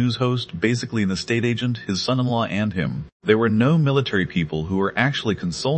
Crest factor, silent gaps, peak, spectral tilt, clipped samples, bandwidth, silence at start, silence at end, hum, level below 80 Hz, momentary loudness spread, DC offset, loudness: 18 dB; 3.12-3.20 s; -2 dBFS; -6 dB/octave; under 0.1%; 8.8 kHz; 0 s; 0 s; none; -52 dBFS; 7 LU; under 0.1%; -22 LUFS